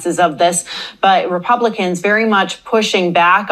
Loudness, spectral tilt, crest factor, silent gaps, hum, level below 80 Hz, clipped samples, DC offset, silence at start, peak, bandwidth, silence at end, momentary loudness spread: -14 LUFS; -3.5 dB/octave; 14 dB; none; none; -60 dBFS; under 0.1%; under 0.1%; 0 s; 0 dBFS; 14.5 kHz; 0 s; 5 LU